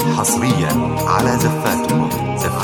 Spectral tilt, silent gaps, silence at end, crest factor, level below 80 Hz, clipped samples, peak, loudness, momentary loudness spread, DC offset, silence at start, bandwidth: -5 dB/octave; none; 0 s; 14 dB; -40 dBFS; under 0.1%; -2 dBFS; -17 LUFS; 4 LU; under 0.1%; 0 s; over 20 kHz